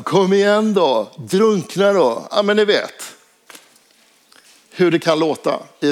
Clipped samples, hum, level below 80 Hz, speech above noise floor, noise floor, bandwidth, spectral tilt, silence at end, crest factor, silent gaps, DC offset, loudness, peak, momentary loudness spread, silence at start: under 0.1%; none; -74 dBFS; 38 dB; -54 dBFS; 15.5 kHz; -5 dB/octave; 0 s; 16 dB; none; under 0.1%; -16 LUFS; -2 dBFS; 8 LU; 0 s